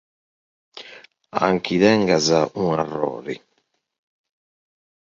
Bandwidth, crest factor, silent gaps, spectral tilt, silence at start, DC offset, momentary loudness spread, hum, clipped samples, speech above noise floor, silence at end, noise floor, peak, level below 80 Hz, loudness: 7.6 kHz; 20 dB; none; -5 dB/octave; 0.75 s; under 0.1%; 22 LU; none; under 0.1%; 51 dB; 1.7 s; -70 dBFS; -2 dBFS; -58 dBFS; -20 LUFS